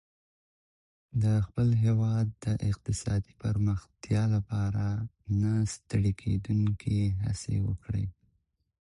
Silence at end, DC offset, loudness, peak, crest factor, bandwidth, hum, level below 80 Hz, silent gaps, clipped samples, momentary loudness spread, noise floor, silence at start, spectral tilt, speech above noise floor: 0.75 s; under 0.1%; -30 LUFS; -16 dBFS; 14 dB; 11 kHz; none; -46 dBFS; none; under 0.1%; 6 LU; -75 dBFS; 1.15 s; -7.5 dB/octave; 47 dB